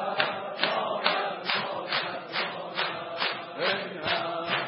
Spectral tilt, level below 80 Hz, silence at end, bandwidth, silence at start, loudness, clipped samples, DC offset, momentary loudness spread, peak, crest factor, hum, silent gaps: -7.5 dB/octave; -74 dBFS; 0 s; 5.8 kHz; 0 s; -29 LUFS; under 0.1%; under 0.1%; 4 LU; -8 dBFS; 22 dB; none; none